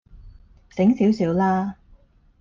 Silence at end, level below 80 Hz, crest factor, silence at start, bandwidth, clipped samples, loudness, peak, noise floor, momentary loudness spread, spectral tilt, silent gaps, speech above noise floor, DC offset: 0.65 s; -50 dBFS; 14 dB; 0.15 s; 7.2 kHz; under 0.1%; -21 LUFS; -8 dBFS; -54 dBFS; 12 LU; -8.5 dB/octave; none; 34 dB; under 0.1%